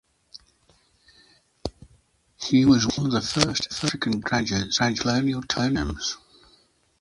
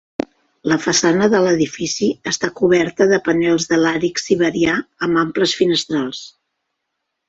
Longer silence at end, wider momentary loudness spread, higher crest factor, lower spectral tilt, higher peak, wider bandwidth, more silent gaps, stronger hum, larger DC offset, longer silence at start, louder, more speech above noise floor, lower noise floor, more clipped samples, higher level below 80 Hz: second, 0.85 s vs 1 s; first, 17 LU vs 8 LU; first, 24 dB vs 16 dB; about the same, -4 dB/octave vs -4 dB/octave; about the same, 0 dBFS vs -2 dBFS; first, 11.5 kHz vs 8 kHz; neither; neither; neither; second, 0.35 s vs 0.65 s; second, -23 LUFS vs -17 LUFS; second, 39 dB vs 59 dB; second, -62 dBFS vs -76 dBFS; neither; first, -46 dBFS vs -54 dBFS